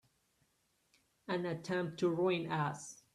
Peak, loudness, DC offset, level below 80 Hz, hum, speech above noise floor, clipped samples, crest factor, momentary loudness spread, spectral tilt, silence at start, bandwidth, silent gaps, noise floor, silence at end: -22 dBFS; -36 LUFS; under 0.1%; -78 dBFS; none; 42 dB; under 0.1%; 16 dB; 9 LU; -6 dB/octave; 1.3 s; 12.5 kHz; none; -78 dBFS; 0.2 s